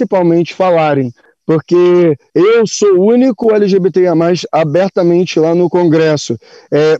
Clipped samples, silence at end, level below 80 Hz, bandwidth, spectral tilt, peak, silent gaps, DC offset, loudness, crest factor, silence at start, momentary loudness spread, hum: under 0.1%; 0 s; -58 dBFS; 8 kHz; -6.5 dB/octave; -2 dBFS; none; under 0.1%; -11 LUFS; 10 dB; 0 s; 7 LU; none